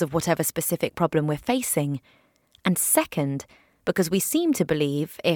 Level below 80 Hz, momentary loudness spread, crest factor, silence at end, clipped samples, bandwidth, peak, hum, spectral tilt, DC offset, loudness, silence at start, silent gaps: -58 dBFS; 8 LU; 18 dB; 0 s; under 0.1%; 19 kHz; -6 dBFS; none; -4.5 dB/octave; under 0.1%; -24 LUFS; 0 s; none